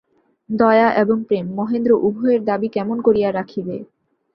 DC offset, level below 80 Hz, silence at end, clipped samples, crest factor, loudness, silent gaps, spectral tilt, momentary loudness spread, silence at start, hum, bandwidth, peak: under 0.1%; -58 dBFS; 0.5 s; under 0.1%; 18 dB; -18 LUFS; none; -9.5 dB/octave; 13 LU; 0.5 s; none; 5.8 kHz; -2 dBFS